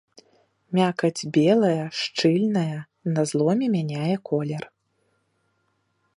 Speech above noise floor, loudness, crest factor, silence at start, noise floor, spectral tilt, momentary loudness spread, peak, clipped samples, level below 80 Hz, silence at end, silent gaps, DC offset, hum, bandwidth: 48 dB; -23 LUFS; 18 dB; 0.7 s; -71 dBFS; -6 dB/octave; 10 LU; -6 dBFS; under 0.1%; -72 dBFS; 1.5 s; none; under 0.1%; none; 11.5 kHz